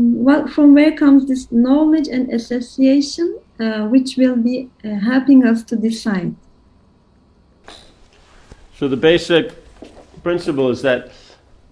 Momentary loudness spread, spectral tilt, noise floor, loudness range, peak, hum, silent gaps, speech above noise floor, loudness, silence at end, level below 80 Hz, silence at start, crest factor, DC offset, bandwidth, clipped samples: 12 LU; -6 dB/octave; -52 dBFS; 8 LU; 0 dBFS; none; none; 38 dB; -15 LUFS; 0.65 s; -48 dBFS; 0 s; 16 dB; under 0.1%; 10.5 kHz; under 0.1%